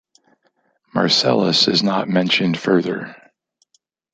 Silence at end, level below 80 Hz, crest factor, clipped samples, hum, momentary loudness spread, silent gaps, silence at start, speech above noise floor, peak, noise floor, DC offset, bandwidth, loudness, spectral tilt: 1 s; -62 dBFS; 18 dB; under 0.1%; none; 12 LU; none; 0.95 s; 48 dB; -2 dBFS; -65 dBFS; under 0.1%; 9.2 kHz; -17 LUFS; -4.5 dB/octave